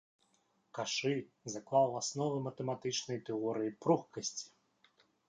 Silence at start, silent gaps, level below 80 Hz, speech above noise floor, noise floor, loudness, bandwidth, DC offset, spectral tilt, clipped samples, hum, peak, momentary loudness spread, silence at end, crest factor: 0.75 s; none; -80 dBFS; 40 dB; -76 dBFS; -36 LUFS; 9.6 kHz; under 0.1%; -4.5 dB/octave; under 0.1%; none; -18 dBFS; 13 LU; 0.8 s; 20 dB